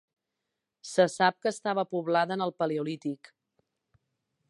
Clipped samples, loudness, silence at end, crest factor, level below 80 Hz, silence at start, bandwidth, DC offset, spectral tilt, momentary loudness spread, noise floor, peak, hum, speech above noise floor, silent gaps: under 0.1%; -29 LUFS; 1.35 s; 22 dB; -84 dBFS; 0.85 s; 11.5 kHz; under 0.1%; -5 dB/octave; 12 LU; -85 dBFS; -8 dBFS; none; 57 dB; none